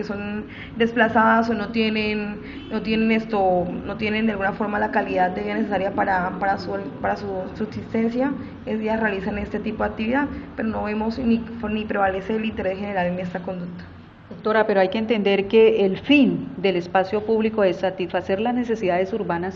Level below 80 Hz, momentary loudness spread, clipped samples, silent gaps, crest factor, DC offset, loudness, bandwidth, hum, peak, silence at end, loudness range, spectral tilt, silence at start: -46 dBFS; 12 LU; under 0.1%; none; 18 dB; under 0.1%; -22 LUFS; 7 kHz; none; -4 dBFS; 0 s; 6 LU; -7.5 dB/octave; 0 s